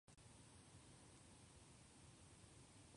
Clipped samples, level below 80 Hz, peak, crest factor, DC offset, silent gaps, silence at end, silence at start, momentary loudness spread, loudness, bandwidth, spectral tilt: under 0.1%; -76 dBFS; -52 dBFS; 14 dB; under 0.1%; none; 0 s; 0.05 s; 1 LU; -65 LUFS; 11 kHz; -3.5 dB/octave